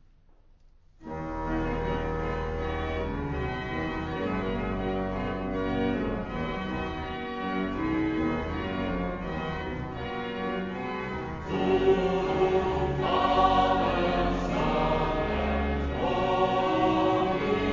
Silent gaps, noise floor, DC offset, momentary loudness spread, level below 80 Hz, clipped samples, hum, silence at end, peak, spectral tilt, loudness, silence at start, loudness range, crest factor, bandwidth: none; -57 dBFS; under 0.1%; 9 LU; -40 dBFS; under 0.1%; none; 0 s; -10 dBFS; -7 dB/octave; -28 LUFS; 1 s; 6 LU; 18 dB; 7.6 kHz